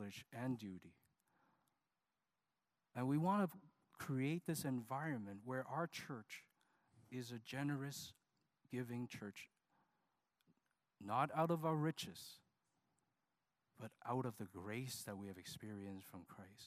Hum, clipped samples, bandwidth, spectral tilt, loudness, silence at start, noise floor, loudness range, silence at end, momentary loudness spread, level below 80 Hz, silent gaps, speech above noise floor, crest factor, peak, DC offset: none; under 0.1%; 15.5 kHz; -6 dB/octave; -45 LUFS; 0 s; under -90 dBFS; 7 LU; 0 s; 18 LU; -88 dBFS; none; over 45 dB; 22 dB; -24 dBFS; under 0.1%